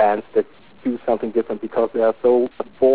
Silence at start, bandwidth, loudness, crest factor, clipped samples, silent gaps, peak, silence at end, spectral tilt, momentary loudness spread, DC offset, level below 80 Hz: 0 s; 4 kHz; -21 LUFS; 14 dB; under 0.1%; none; -6 dBFS; 0 s; -10 dB/octave; 9 LU; 0.6%; -60 dBFS